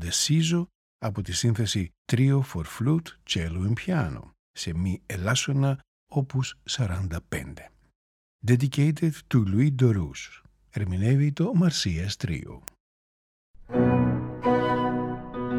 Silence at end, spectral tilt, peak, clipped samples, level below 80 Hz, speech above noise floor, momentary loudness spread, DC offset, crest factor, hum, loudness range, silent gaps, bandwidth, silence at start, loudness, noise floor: 0 s; -5.5 dB/octave; -8 dBFS; under 0.1%; -48 dBFS; over 65 dB; 13 LU; under 0.1%; 18 dB; none; 4 LU; 0.75-0.99 s, 1.98-2.05 s, 4.39-4.54 s, 5.88-6.07 s, 7.95-8.39 s, 12.80-13.54 s; 16.5 kHz; 0 s; -26 LUFS; under -90 dBFS